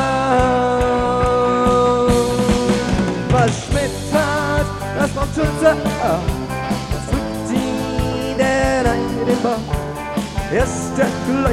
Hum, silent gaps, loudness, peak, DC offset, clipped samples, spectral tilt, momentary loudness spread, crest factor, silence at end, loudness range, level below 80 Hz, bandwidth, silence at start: none; none; -18 LUFS; -2 dBFS; under 0.1%; under 0.1%; -5.5 dB/octave; 7 LU; 16 dB; 0 s; 3 LU; -30 dBFS; 16 kHz; 0 s